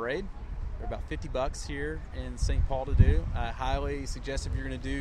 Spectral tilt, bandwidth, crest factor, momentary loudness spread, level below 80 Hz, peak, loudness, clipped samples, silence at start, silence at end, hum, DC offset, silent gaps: -6 dB/octave; 10.5 kHz; 24 dB; 14 LU; -32 dBFS; -6 dBFS; -32 LUFS; under 0.1%; 0 s; 0 s; none; under 0.1%; none